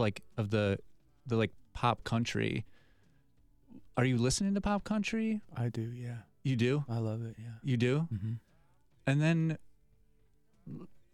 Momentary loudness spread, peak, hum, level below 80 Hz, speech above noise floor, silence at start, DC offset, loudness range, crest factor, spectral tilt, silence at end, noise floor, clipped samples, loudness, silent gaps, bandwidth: 14 LU; -14 dBFS; none; -56 dBFS; 38 dB; 0 s; under 0.1%; 2 LU; 22 dB; -6 dB/octave; 0.25 s; -71 dBFS; under 0.1%; -34 LUFS; none; 12.5 kHz